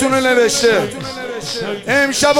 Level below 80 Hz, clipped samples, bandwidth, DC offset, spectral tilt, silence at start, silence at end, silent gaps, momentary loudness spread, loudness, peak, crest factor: -48 dBFS; under 0.1%; 17 kHz; under 0.1%; -2.5 dB/octave; 0 s; 0 s; none; 12 LU; -15 LUFS; 0 dBFS; 14 dB